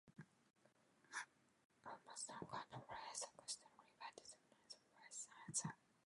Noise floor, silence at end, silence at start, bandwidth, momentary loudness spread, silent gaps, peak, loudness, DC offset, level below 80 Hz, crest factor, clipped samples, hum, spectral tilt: -77 dBFS; 0.3 s; 0.05 s; 11 kHz; 16 LU; 1.65-1.70 s; -30 dBFS; -53 LUFS; under 0.1%; -86 dBFS; 26 dB; under 0.1%; none; -2 dB/octave